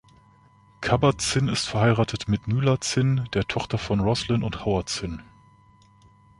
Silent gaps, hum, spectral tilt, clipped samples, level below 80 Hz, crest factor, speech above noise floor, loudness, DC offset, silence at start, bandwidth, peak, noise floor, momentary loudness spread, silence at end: none; none; -5.5 dB/octave; under 0.1%; -44 dBFS; 20 dB; 32 dB; -24 LUFS; under 0.1%; 0.8 s; 11.5 kHz; -4 dBFS; -56 dBFS; 7 LU; 1.2 s